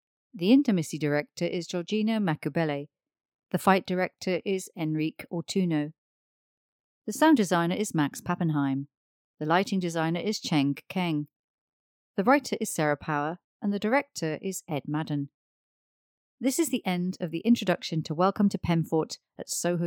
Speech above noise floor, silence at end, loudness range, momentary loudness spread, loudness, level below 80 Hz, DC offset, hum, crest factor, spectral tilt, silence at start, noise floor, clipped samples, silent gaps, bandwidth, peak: over 63 dB; 0 s; 4 LU; 10 LU; -28 LUFS; -66 dBFS; under 0.1%; none; 20 dB; -5.5 dB/octave; 0.35 s; under -90 dBFS; under 0.1%; 3.25-3.29 s, 3.35-3.39 s, 5.98-7.02 s, 8.97-9.34 s, 11.36-12.14 s, 13.44-13.60 s, 15.34-16.38 s; 19 kHz; -8 dBFS